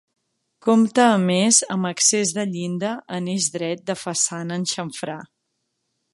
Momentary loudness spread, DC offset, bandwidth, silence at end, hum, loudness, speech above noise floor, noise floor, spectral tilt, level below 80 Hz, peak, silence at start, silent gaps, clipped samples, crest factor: 12 LU; under 0.1%; 11.5 kHz; 0.9 s; none; -20 LUFS; 55 dB; -75 dBFS; -3.5 dB/octave; -70 dBFS; -2 dBFS; 0.65 s; none; under 0.1%; 20 dB